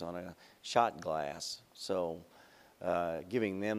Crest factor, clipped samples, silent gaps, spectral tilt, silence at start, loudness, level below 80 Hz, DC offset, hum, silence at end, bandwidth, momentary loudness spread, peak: 24 dB; under 0.1%; none; -4.5 dB/octave; 0 s; -36 LUFS; -70 dBFS; under 0.1%; none; 0 s; 15.5 kHz; 14 LU; -12 dBFS